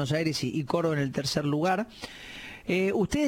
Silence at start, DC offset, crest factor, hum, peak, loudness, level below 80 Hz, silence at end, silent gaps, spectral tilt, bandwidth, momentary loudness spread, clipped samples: 0 s; under 0.1%; 16 dB; none; -12 dBFS; -28 LUFS; -54 dBFS; 0 s; none; -5.5 dB/octave; 16.5 kHz; 14 LU; under 0.1%